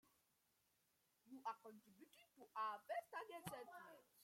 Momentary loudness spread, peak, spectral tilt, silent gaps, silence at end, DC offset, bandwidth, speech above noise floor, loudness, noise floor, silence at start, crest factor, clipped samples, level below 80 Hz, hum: 19 LU; -34 dBFS; -4 dB/octave; none; 0 s; under 0.1%; 16.5 kHz; 30 dB; -53 LUFS; -84 dBFS; 1.25 s; 22 dB; under 0.1%; under -90 dBFS; none